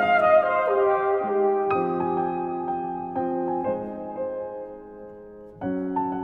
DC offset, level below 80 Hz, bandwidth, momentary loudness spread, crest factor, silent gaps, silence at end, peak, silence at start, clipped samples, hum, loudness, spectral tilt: under 0.1%; -60 dBFS; 4.6 kHz; 20 LU; 16 dB; none; 0 s; -8 dBFS; 0 s; under 0.1%; none; -24 LUFS; -8.5 dB/octave